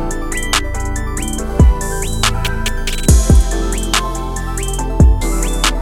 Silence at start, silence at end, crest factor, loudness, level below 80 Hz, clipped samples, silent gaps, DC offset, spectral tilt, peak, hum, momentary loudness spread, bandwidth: 0 s; 0 s; 14 dB; -16 LUFS; -16 dBFS; under 0.1%; none; under 0.1%; -4 dB/octave; 0 dBFS; none; 9 LU; 16.5 kHz